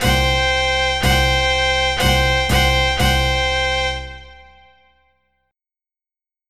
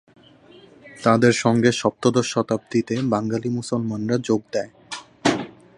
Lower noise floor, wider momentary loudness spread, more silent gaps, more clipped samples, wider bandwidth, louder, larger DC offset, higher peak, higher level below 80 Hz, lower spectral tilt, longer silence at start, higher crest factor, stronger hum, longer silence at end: first, under -90 dBFS vs -49 dBFS; second, 4 LU vs 11 LU; neither; neither; first, 15 kHz vs 11.5 kHz; first, -16 LUFS vs -21 LUFS; first, 0.9% vs under 0.1%; about the same, -4 dBFS vs -2 dBFS; first, -26 dBFS vs -58 dBFS; second, -3.5 dB/octave vs -5.5 dB/octave; second, 0 s vs 0.85 s; second, 14 dB vs 20 dB; neither; first, 2.05 s vs 0.3 s